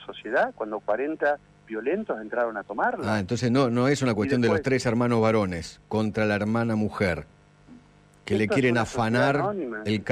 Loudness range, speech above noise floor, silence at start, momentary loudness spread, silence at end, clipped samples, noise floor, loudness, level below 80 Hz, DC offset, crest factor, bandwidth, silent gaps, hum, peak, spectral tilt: 4 LU; 30 dB; 0 s; 8 LU; 0 s; under 0.1%; -54 dBFS; -25 LUFS; -54 dBFS; under 0.1%; 14 dB; 12.5 kHz; none; none; -12 dBFS; -6.5 dB/octave